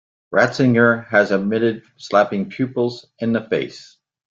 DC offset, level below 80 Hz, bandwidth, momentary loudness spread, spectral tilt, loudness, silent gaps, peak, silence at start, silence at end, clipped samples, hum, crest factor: under 0.1%; -60 dBFS; 7.6 kHz; 9 LU; -6.5 dB/octave; -19 LUFS; none; -2 dBFS; 0.3 s; 0.6 s; under 0.1%; none; 18 dB